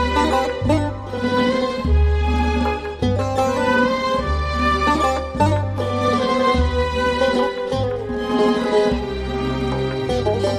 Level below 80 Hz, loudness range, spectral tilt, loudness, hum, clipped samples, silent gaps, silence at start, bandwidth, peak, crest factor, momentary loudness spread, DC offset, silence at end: -26 dBFS; 1 LU; -6 dB/octave; -19 LUFS; none; under 0.1%; none; 0 s; 11.5 kHz; -4 dBFS; 14 dB; 5 LU; under 0.1%; 0 s